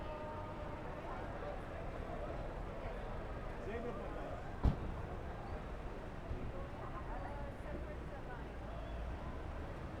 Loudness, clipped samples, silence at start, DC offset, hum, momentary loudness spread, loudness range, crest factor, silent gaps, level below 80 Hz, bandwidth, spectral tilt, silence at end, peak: -46 LUFS; under 0.1%; 0 s; under 0.1%; none; 4 LU; 3 LU; 26 dB; none; -46 dBFS; 11 kHz; -7.5 dB/octave; 0 s; -18 dBFS